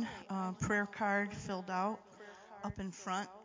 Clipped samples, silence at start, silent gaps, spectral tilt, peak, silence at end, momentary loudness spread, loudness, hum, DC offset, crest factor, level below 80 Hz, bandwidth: under 0.1%; 0 s; none; -5 dB/octave; -22 dBFS; 0 s; 13 LU; -38 LUFS; none; under 0.1%; 18 dB; -62 dBFS; 7.6 kHz